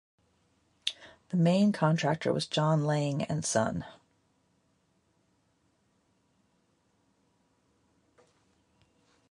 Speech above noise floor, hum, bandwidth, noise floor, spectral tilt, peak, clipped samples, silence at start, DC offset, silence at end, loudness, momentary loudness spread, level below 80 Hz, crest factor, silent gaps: 44 dB; none; 11.5 kHz; -72 dBFS; -5.5 dB/octave; -10 dBFS; under 0.1%; 0.85 s; under 0.1%; 5.4 s; -29 LUFS; 11 LU; -66 dBFS; 22 dB; none